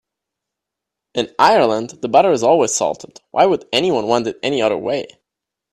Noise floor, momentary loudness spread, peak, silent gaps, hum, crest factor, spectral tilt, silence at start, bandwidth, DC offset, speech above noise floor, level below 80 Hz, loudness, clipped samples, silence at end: -83 dBFS; 11 LU; 0 dBFS; none; none; 18 dB; -3.5 dB/octave; 1.15 s; 13 kHz; under 0.1%; 67 dB; -60 dBFS; -16 LUFS; under 0.1%; 0.65 s